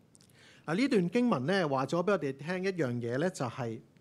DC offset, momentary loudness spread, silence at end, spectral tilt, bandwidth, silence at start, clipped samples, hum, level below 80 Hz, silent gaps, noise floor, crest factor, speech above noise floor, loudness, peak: under 0.1%; 8 LU; 0.2 s; -6.5 dB/octave; 12.5 kHz; 0.65 s; under 0.1%; none; -80 dBFS; none; -60 dBFS; 18 dB; 29 dB; -31 LUFS; -14 dBFS